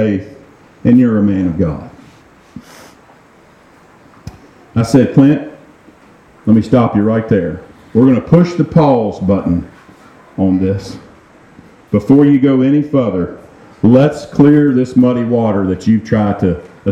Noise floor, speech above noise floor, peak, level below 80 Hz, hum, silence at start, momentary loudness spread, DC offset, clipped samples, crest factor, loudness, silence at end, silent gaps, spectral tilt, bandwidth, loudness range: -45 dBFS; 34 dB; 0 dBFS; -42 dBFS; none; 0 s; 11 LU; under 0.1%; under 0.1%; 14 dB; -12 LUFS; 0 s; none; -9 dB/octave; 9.2 kHz; 6 LU